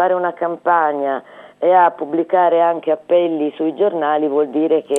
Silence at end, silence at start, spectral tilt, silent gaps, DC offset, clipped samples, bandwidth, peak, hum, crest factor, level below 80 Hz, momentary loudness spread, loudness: 0 s; 0 s; -5.5 dB/octave; none; under 0.1%; under 0.1%; 4 kHz; -2 dBFS; none; 14 dB; -80 dBFS; 7 LU; -17 LUFS